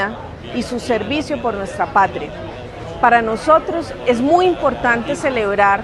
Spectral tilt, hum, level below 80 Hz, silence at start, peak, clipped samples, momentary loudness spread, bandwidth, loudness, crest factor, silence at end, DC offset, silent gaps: -5 dB/octave; none; -40 dBFS; 0 s; 0 dBFS; under 0.1%; 14 LU; 12 kHz; -17 LUFS; 16 dB; 0 s; under 0.1%; none